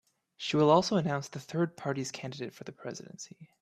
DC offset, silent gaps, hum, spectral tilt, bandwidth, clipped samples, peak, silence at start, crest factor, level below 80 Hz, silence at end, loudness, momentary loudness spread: under 0.1%; none; none; -5.5 dB/octave; 14 kHz; under 0.1%; -10 dBFS; 0.4 s; 22 dB; -70 dBFS; 0.15 s; -30 LUFS; 19 LU